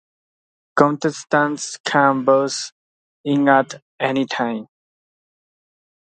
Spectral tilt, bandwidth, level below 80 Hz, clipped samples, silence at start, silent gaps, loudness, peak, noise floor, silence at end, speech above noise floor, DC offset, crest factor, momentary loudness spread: -4.5 dB/octave; 9.4 kHz; -68 dBFS; under 0.1%; 0.75 s; 1.80-1.84 s, 2.72-3.24 s, 3.82-3.99 s; -19 LUFS; 0 dBFS; under -90 dBFS; 1.5 s; over 72 dB; under 0.1%; 20 dB; 12 LU